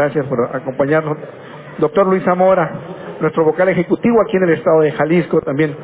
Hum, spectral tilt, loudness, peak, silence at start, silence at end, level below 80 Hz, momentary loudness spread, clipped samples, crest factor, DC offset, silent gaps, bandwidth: none; -11.5 dB/octave; -15 LUFS; -2 dBFS; 0 s; 0 s; -52 dBFS; 13 LU; under 0.1%; 12 dB; under 0.1%; none; 4 kHz